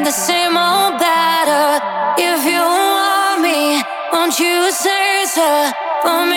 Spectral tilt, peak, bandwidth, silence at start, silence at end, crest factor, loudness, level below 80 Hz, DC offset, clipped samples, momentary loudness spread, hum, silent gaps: -1 dB/octave; -2 dBFS; 19 kHz; 0 s; 0 s; 12 dB; -14 LUFS; -68 dBFS; under 0.1%; under 0.1%; 3 LU; none; none